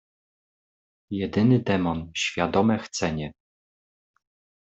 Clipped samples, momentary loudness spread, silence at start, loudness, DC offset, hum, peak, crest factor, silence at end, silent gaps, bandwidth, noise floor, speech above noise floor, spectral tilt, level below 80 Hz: under 0.1%; 12 LU; 1.1 s; -25 LUFS; under 0.1%; none; -8 dBFS; 20 dB; 1.3 s; none; 8.2 kHz; under -90 dBFS; over 66 dB; -5.5 dB/octave; -56 dBFS